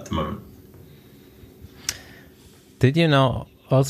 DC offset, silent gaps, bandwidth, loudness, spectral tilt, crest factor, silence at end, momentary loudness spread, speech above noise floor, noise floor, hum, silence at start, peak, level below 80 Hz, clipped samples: under 0.1%; none; 15 kHz; -22 LUFS; -6 dB/octave; 22 dB; 0 s; 16 LU; 30 dB; -50 dBFS; none; 0 s; -2 dBFS; -46 dBFS; under 0.1%